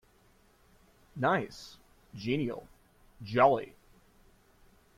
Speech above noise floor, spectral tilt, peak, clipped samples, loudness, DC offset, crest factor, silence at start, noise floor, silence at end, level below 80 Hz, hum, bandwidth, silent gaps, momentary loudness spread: 35 dB; -6.5 dB/octave; -10 dBFS; under 0.1%; -30 LUFS; under 0.1%; 24 dB; 1.15 s; -64 dBFS; 1.3 s; -64 dBFS; none; 15 kHz; none; 25 LU